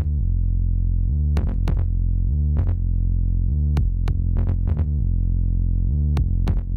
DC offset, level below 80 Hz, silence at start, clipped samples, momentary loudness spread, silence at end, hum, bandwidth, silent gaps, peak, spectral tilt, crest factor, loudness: under 0.1%; -20 dBFS; 0 s; under 0.1%; 2 LU; 0 s; none; 4.4 kHz; none; -8 dBFS; -9.5 dB/octave; 10 dB; -23 LUFS